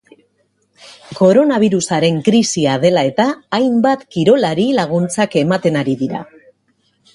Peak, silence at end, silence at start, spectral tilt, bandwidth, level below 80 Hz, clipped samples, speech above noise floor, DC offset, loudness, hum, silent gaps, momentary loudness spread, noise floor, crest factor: 0 dBFS; 0.9 s; 0.9 s; -5.5 dB/octave; 11.5 kHz; -56 dBFS; under 0.1%; 48 dB; under 0.1%; -14 LUFS; none; none; 6 LU; -62 dBFS; 14 dB